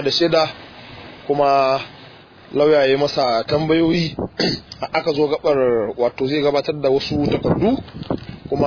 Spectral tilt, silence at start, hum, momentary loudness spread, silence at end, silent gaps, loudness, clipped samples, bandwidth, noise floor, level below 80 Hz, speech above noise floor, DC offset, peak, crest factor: -6 dB/octave; 0 s; none; 12 LU; 0 s; none; -19 LUFS; under 0.1%; 5.4 kHz; -43 dBFS; -46 dBFS; 25 dB; under 0.1%; -4 dBFS; 14 dB